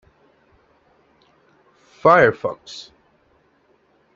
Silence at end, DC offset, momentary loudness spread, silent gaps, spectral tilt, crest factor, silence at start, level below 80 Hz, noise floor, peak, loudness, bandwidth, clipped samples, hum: 1.35 s; under 0.1%; 23 LU; none; -6 dB/octave; 22 dB; 2.05 s; -60 dBFS; -60 dBFS; -2 dBFS; -16 LUFS; 7.6 kHz; under 0.1%; none